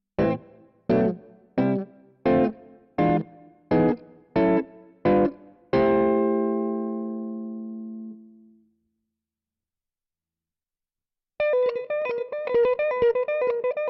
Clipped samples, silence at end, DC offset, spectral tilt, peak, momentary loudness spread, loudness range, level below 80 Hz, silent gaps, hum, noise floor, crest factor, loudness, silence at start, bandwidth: under 0.1%; 0 s; under 0.1%; -7 dB/octave; -10 dBFS; 14 LU; 13 LU; -54 dBFS; none; none; -90 dBFS; 16 dB; -24 LUFS; 0.2 s; 5.8 kHz